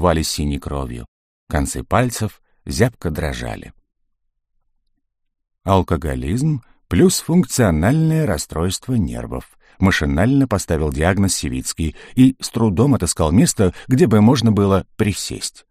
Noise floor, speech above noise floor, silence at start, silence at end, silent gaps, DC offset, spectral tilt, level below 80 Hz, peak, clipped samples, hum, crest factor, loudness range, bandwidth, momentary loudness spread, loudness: -70 dBFS; 53 dB; 0 s; 0.2 s; 1.08-1.47 s; under 0.1%; -5.5 dB/octave; -32 dBFS; -2 dBFS; under 0.1%; none; 16 dB; 9 LU; 15.5 kHz; 12 LU; -18 LUFS